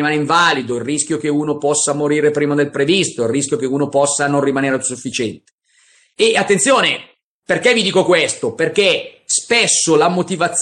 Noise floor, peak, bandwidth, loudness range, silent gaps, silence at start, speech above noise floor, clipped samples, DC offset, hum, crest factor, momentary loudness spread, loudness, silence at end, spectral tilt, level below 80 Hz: -54 dBFS; -2 dBFS; 11.5 kHz; 3 LU; 5.52-5.58 s, 7.23-7.40 s; 0 s; 39 dB; under 0.1%; under 0.1%; none; 14 dB; 7 LU; -15 LUFS; 0 s; -3 dB/octave; -60 dBFS